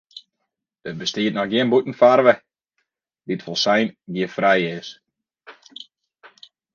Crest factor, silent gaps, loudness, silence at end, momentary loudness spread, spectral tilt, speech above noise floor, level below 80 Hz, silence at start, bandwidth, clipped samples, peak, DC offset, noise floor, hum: 22 dB; none; -19 LUFS; 0.45 s; 24 LU; -5 dB/octave; 60 dB; -68 dBFS; 0.15 s; 7.2 kHz; under 0.1%; 0 dBFS; under 0.1%; -79 dBFS; none